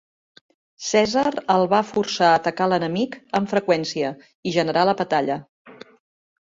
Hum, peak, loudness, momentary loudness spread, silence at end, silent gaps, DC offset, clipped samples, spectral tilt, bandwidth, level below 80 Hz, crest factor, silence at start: none; -4 dBFS; -21 LUFS; 9 LU; 0.75 s; 4.35-4.43 s, 5.49-5.65 s; under 0.1%; under 0.1%; -4.5 dB/octave; 7.8 kHz; -62 dBFS; 18 dB; 0.8 s